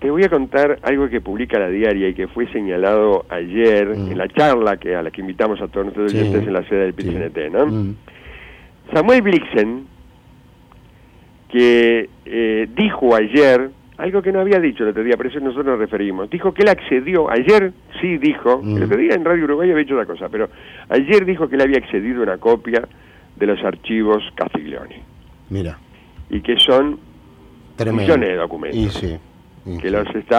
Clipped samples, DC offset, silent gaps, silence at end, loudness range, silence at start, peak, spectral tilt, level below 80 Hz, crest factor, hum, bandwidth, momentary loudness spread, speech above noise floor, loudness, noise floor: under 0.1%; under 0.1%; none; 0 s; 4 LU; 0 s; -2 dBFS; -6.5 dB/octave; -42 dBFS; 14 dB; none; 10 kHz; 12 LU; 30 dB; -17 LUFS; -46 dBFS